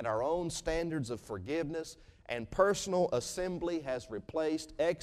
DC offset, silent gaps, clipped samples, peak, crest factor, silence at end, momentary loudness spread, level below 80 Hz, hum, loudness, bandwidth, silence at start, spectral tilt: under 0.1%; none; under 0.1%; -14 dBFS; 20 dB; 0 s; 11 LU; -54 dBFS; none; -35 LUFS; 15 kHz; 0 s; -4.5 dB/octave